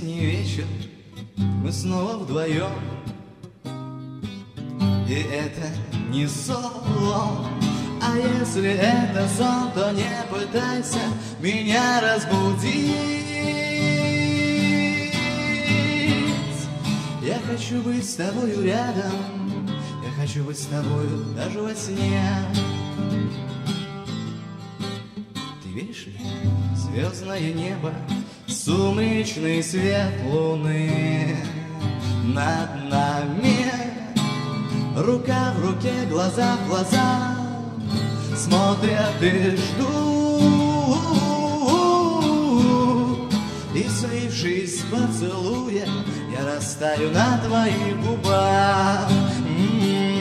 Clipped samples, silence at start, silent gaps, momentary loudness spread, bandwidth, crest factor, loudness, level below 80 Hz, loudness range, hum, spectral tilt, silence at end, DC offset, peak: under 0.1%; 0 s; none; 10 LU; 14.5 kHz; 20 dB; -23 LUFS; -54 dBFS; 8 LU; none; -5.5 dB/octave; 0 s; under 0.1%; -4 dBFS